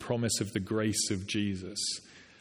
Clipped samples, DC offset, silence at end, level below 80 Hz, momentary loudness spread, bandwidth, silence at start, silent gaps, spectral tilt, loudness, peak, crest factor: under 0.1%; under 0.1%; 0.15 s; -66 dBFS; 5 LU; 14.5 kHz; 0 s; none; -3.5 dB/octave; -32 LUFS; -16 dBFS; 16 dB